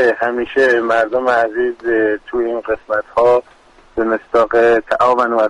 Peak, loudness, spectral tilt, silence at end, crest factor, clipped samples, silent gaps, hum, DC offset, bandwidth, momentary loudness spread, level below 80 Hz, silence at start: -4 dBFS; -15 LUFS; -5.5 dB/octave; 0 s; 12 dB; under 0.1%; none; none; under 0.1%; 10.5 kHz; 7 LU; -48 dBFS; 0 s